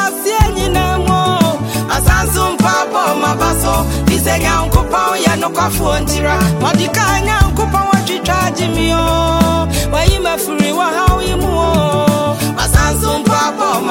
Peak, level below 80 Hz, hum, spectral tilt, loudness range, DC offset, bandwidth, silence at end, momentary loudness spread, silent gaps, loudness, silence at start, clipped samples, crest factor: 0 dBFS; -20 dBFS; none; -4.5 dB/octave; 0 LU; under 0.1%; 17 kHz; 0 s; 3 LU; none; -13 LUFS; 0 s; under 0.1%; 12 dB